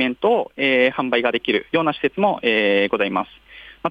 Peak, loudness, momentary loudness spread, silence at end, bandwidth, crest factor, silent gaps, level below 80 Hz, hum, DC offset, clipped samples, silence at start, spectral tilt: -6 dBFS; -19 LUFS; 5 LU; 0 s; 5.4 kHz; 14 dB; none; -58 dBFS; none; under 0.1%; under 0.1%; 0 s; -6.5 dB/octave